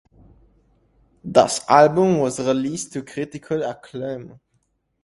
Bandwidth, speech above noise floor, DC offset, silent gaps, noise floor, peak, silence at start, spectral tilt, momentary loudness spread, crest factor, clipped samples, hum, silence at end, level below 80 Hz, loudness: 11.5 kHz; 49 dB; under 0.1%; none; -68 dBFS; 0 dBFS; 1.25 s; -5 dB/octave; 16 LU; 22 dB; under 0.1%; none; 0.75 s; -58 dBFS; -20 LUFS